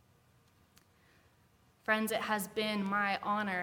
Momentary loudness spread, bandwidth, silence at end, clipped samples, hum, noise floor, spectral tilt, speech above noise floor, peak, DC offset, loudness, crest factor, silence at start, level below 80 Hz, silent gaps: 3 LU; 18 kHz; 0 s; under 0.1%; none; -68 dBFS; -4 dB/octave; 34 dB; -16 dBFS; under 0.1%; -34 LUFS; 22 dB; 1.9 s; -74 dBFS; none